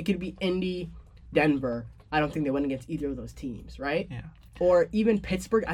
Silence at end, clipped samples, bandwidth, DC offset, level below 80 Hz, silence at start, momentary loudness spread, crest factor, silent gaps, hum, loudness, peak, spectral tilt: 0 s; under 0.1%; 14.5 kHz; under 0.1%; -48 dBFS; 0 s; 15 LU; 16 dB; none; none; -28 LUFS; -12 dBFS; -6.5 dB/octave